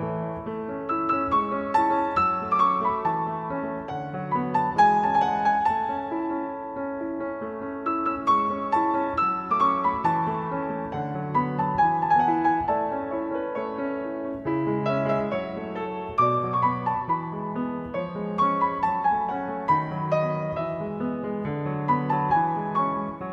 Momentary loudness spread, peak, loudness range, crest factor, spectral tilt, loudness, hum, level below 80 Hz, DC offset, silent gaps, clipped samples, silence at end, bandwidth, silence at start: 9 LU; -8 dBFS; 3 LU; 16 dB; -8 dB/octave; -25 LUFS; none; -56 dBFS; under 0.1%; none; under 0.1%; 0 s; 7.8 kHz; 0 s